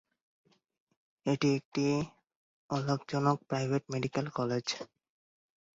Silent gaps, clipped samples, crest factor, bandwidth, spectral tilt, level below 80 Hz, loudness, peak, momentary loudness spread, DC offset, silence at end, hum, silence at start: 1.65-1.72 s, 2.36-2.69 s; under 0.1%; 22 dB; 7.8 kHz; -6 dB/octave; -68 dBFS; -33 LUFS; -14 dBFS; 8 LU; under 0.1%; 0.9 s; none; 1.25 s